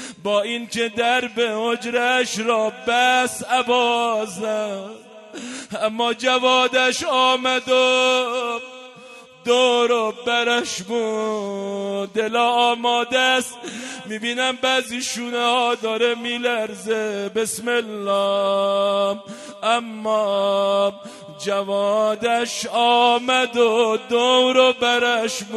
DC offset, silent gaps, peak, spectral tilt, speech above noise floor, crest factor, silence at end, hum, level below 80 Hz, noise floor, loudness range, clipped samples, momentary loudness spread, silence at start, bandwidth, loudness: under 0.1%; none; -2 dBFS; -2 dB/octave; 23 dB; 18 dB; 0 s; none; -68 dBFS; -43 dBFS; 4 LU; under 0.1%; 10 LU; 0 s; 12.5 kHz; -19 LUFS